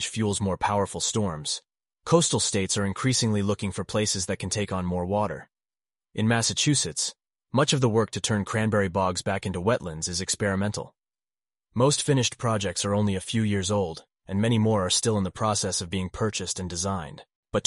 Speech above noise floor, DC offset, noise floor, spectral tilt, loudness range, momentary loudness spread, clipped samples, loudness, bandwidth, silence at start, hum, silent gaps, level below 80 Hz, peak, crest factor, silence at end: over 64 dB; under 0.1%; under -90 dBFS; -4 dB/octave; 2 LU; 8 LU; under 0.1%; -26 LUFS; 11.5 kHz; 0 s; none; 17.35-17.43 s; -54 dBFS; -6 dBFS; 20 dB; 0.05 s